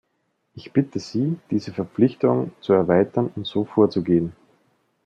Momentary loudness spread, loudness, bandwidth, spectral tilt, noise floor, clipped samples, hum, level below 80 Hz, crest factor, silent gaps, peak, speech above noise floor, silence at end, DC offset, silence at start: 8 LU; -22 LUFS; 7.8 kHz; -8 dB/octave; -72 dBFS; under 0.1%; none; -62 dBFS; 18 dB; none; -4 dBFS; 51 dB; 0.75 s; under 0.1%; 0.55 s